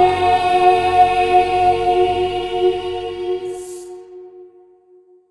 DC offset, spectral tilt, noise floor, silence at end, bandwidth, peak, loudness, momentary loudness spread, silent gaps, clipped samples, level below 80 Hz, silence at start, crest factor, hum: under 0.1%; -5 dB/octave; -50 dBFS; 0.85 s; 12 kHz; -2 dBFS; -16 LUFS; 17 LU; none; under 0.1%; -44 dBFS; 0 s; 16 dB; none